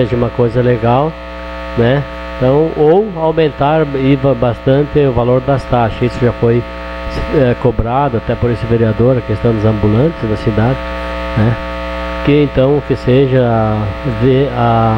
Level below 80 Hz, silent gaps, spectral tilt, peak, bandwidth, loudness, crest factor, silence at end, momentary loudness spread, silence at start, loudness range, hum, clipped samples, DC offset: -28 dBFS; none; -9 dB/octave; 0 dBFS; 7.2 kHz; -13 LUFS; 12 dB; 0 s; 8 LU; 0 s; 2 LU; none; under 0.1%; under 0.1%